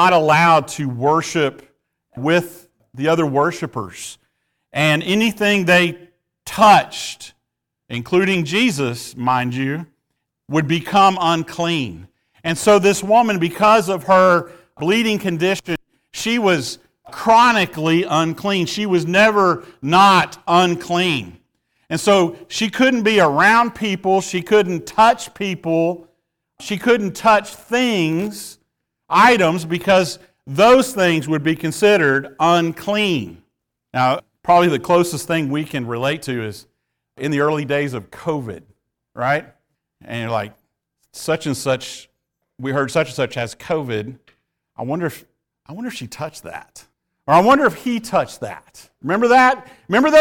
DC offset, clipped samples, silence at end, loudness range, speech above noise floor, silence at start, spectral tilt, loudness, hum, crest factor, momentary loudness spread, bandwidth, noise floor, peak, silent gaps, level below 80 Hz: under 0.1%; under 0.1%; 0 s; 8 LU; 62 dB; 0 s; -5 dB/octave; -17 LUFS; none; 14 dB; 17 LU; 19 kHz; -78 dBFS; -2 dBFS; none; -56 dBFS